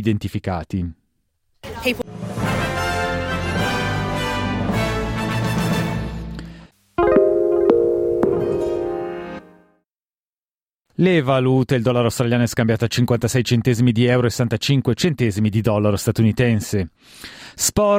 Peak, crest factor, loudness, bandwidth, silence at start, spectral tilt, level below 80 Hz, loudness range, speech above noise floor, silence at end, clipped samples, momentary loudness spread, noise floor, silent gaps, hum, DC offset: -2 dBFS; 18 dB; -19 LUFS; 16.5 kHz; 0 s; -5.5 dB/octave; -40 dBFS; 5 LU; over 72 dB; 0 s; under 0.1%; 13 LU; under -90 dBFS; 10.20-10.42 s; none; under 0.1%